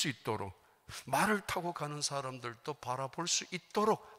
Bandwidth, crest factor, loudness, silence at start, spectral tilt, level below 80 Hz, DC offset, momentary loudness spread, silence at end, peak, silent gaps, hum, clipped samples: 16 kHz; 18 dB; -36 LUFS; 0 s; -3 dB/octave; -68 dBFS; under 0.1%; 11 LU; 0 s; -18 dBFS; none; none; under 0.1%